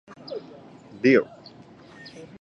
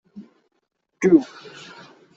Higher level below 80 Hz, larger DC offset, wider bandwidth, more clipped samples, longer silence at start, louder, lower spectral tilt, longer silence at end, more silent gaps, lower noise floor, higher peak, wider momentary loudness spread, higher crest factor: about the same, -70 dBFS vs -66 dBFS; neither; about the same, 7.4 kHz vs 7.8 kHz; neither; first, 0.3 s vs 0.15 s; second, -21 LUFS vs -18 LUFS; about the same, -6.5 dB/octave vs -7 dB/octave; second, 0.15 s vs 0.9 s; neither; about the same, -48 dBFS vs -46 dBFS; about the same, -6 dBFS vs -4 dBFS; about the same, 26 LU vs 24 LU; about the same, 22 dB vs 20 dB